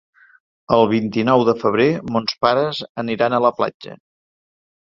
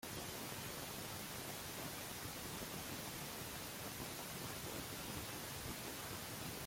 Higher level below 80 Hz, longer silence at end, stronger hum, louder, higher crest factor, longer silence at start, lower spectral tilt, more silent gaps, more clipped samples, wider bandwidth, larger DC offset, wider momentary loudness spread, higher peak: first, -56 dBFS vs -64 dBFS; first, 1 s vs 0 s; neither; first, -18 LUFS vs -46 LUFS; about the same, 20 dB vs 16 dB; first, 0.7 s vs 0 s; first, -7 dB/octave vs -3 dB/octave; first, 2.89-2.95 s, 3.74-3.80 s vs none; neither; second, 7.4 kHz vs 16.5 kHz; neither; first, 9 LU vs 1 LU; first, 0 dBFS vs -32 dBFS